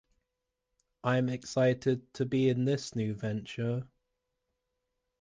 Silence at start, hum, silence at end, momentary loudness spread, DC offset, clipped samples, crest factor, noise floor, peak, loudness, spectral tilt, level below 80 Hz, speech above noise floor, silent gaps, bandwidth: 1.05 s; none; 1.35 s; 8 LU; under 0.1%; under 0.1%; 18 dB; -86 dBFS; -16 dBFS; -31 LUFS; -6.5 dB/octave; -66 dBFS; 55 dB; none; 9.6 kHz